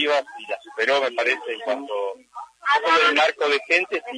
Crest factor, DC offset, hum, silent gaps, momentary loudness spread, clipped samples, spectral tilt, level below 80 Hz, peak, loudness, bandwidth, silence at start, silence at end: 18 dB; under 0.1%; none; none; 15 LU; under 0.1%; -1 dB/octave; -78 dBFS; -6 dBFS; -21 LUFS; 10.5 kHz; 0 s; 0 s